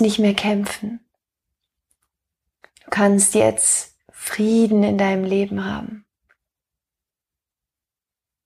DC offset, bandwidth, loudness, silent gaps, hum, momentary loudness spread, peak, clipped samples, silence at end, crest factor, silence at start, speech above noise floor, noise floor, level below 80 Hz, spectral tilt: under 0.1%; 15.5 kHz; -18 LUFS; none; none; 16 LU; -4 dBFS; under 0.1%; 2.45 s; 18 dB; 0 s; 71 dB; -89 dBFS; -56 dBFS; -4 dB/octave